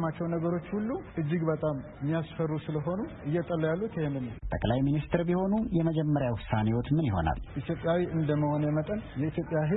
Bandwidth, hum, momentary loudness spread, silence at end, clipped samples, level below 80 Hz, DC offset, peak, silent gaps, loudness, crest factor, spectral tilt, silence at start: 4 kHz; none; 6 LU; 0 s; under 0.1%; -46 dBFS; under 0.1%; -10 dBFS; none; -30 LUFS; 18 dB; -12 dB/octave; 0 s